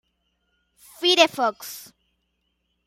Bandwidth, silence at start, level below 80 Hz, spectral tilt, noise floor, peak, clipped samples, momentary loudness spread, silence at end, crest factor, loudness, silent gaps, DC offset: 16 kHz; 1 s; -72 dBFS; -1 dB/octave; -74 dBFS; -2 dBFS; under 0.1%; 20 LU; 1.05 s; 24 dB; -20 LUFS; none; under 0.1%